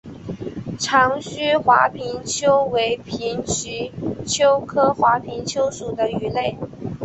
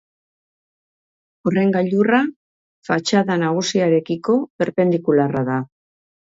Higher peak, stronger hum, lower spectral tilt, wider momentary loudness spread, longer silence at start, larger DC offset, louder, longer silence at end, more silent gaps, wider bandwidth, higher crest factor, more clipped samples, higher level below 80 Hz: about the same, -2 dBFS vs -4 dBFS; neither; second, -3.5 dB/octave vs -6 dB/octave; first, 13 LU vs 8 LU; second, 0.05 s vs 1.45 s; neither; about the same, -20 LUFS vs -19 LUFS; second, 0 s vs 0.75 s; second, none vs 2.36-2.82 s, 4.50-4.59 s; about the same, 8.2 kHz vs 7.8 kHz; about the same, 18 dB vs 16 dB; neither; first, -50 dBFS vs -64 dBFS